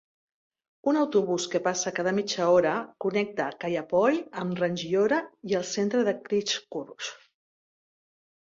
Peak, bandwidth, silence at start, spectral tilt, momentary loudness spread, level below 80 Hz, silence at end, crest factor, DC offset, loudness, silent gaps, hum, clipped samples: -10 dBFS; 7.8 kHz; 0.85 s; -4 dB/octave; 8 LU; -70 dBFS; 1.3 s; 18 dB; under 0.1%; -27 LUFS; none; none; under 0.1%